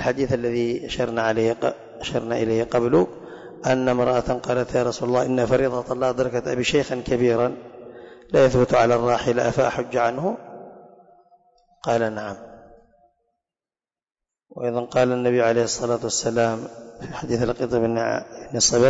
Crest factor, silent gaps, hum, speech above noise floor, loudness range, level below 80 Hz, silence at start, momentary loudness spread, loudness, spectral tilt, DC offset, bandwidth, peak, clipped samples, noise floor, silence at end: 18 dB; none; none; over 69 dB; 9 LU; -48 dBFS; 0 s; 14 LU; -22 LUFS; -4.5 dB/octave; under 0.1%; 8 kHz; -6 dBFS; under 0.1%; under -90 dBFS; 0 s